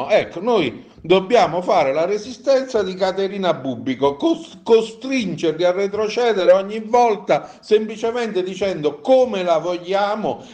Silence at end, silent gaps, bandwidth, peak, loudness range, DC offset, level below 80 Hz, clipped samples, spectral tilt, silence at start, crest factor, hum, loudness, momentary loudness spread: 0 s; none; 9 kHz; -2 dBFS; 2 LU; under 0.1%; -58 dBFS; under 0.1%; -5.5 dB/octave; 0 s; 16 dB; none; -19 LUFS; 7 LU